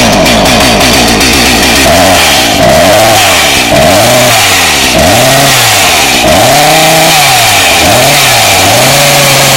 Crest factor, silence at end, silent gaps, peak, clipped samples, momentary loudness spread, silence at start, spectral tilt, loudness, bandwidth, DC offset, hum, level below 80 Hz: 4 dB; 0 s; none; 0 dBFS; 4%; 1 LU; 0 s; -2.5 dB/octave; -3 LUFS; over 20 kHz; under 0.1%; none; -24 dBFS